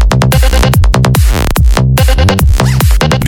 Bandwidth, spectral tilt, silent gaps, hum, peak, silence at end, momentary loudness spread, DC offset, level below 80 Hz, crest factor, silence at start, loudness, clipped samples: 18 kHz; -5.5 dB/octave; none; none; 0 dBFS; 0 s; 1 LU; under 0.1%; -10 dBFS; 6 dB; 0 s; -9 LUFS; under 0.1%